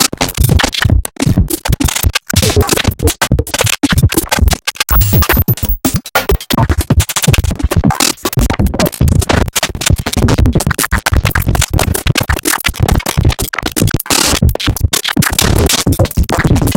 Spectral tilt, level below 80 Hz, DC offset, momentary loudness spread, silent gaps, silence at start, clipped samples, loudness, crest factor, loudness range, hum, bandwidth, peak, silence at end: -4 dB/octave; -18 dBFS; under 0.1%; 3 LU; none; 0 s; under 0.1%; -12 LUFS; 12 dB; 1 LU; none; 17.5 kHz; 0 dBFS; 0 s